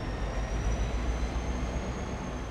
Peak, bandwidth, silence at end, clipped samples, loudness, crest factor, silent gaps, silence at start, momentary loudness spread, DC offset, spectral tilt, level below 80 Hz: -18 dBFS; 9.4 kHz; 0 s; under 0.1%; -34 LUFS; 14 dB; none; 0 s; 4 LU; under 0.1%; -6 dB/octave; -34 dBFS